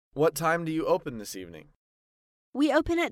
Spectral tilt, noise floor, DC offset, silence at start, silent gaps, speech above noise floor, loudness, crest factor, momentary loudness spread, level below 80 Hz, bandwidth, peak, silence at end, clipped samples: -5 dB/octave; under -90 dBFS; under 0.1%; 0.15 s; 1.76-2.53 s; over 63 dB; -27 LUFS; 16 dB; 15 LU; -52 dBFS; 16.5 kHz; -12 dBFS; 0 s; under 0.1%